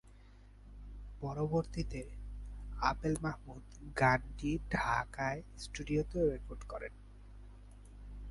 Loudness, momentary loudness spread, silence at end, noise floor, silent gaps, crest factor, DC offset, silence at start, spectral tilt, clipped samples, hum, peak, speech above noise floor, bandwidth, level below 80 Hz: -37 LUFS; 24 LU; 0 s; -57 dBFS; none; 24 dB; under 0.1%; 0.05 s; -6 dB/octave; under 0.1%; 50 Hz at -50 dBFS; -14 dBFS; 21 dB; 11.5 kHz; -48 dBFS